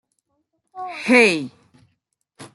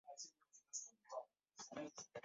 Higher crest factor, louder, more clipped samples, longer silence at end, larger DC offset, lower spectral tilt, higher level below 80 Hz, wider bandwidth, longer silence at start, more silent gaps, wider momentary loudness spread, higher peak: about the same, 20 dB vs 22 dB; first, -16 LUFS vs -54 LUFS; neither; about the same, 0.1 s vs 0.05 s; neither; first, -4 dB/octave vs -2.5 dB/octave; first, -72 dBFS vs under -90 dBFS; first, 12 kHz vs 7.6 kHz; first, 0.75 s vs 0.05 s; neither; first, 21 LU vs 8 LU; first, -2 dBFS vs -34 dBFS